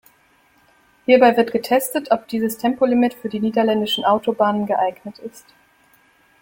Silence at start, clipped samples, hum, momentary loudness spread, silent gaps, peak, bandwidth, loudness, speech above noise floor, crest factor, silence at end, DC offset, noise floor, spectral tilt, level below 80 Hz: 1.1 s; under 0.1%; none; 13 LU; none; -2 dBFS; 17 kHz; -18 LUFS; 39 dB; 18 dB; 1.05 s; under 0.1%; -57 dBFS; -4.5 dB/octave; -62 dBFS